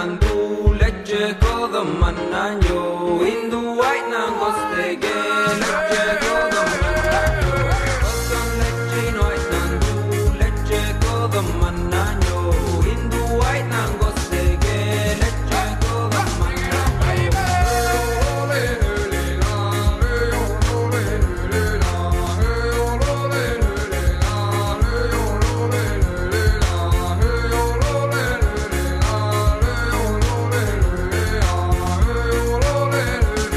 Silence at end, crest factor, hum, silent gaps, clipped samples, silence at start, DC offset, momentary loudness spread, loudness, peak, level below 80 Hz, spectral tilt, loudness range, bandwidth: 0 s; 16 dB; none; none; under 0.1%; 0 s; under 0.1%; 3 LU; -20 LUFS; -2 dBFS; -22 dBFS; -5.5 dB/octave; 2 LU; 14 kHz